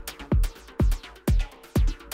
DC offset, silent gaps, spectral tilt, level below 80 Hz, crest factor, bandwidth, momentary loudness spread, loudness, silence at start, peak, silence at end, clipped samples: under 0.1%; none; -6.5 dB/octave; -26 dBFS; 12 dB; 16 kHz; 3 LU; -28 LUFS; 0 s; -12 dBFS; 0 s; under 0.1%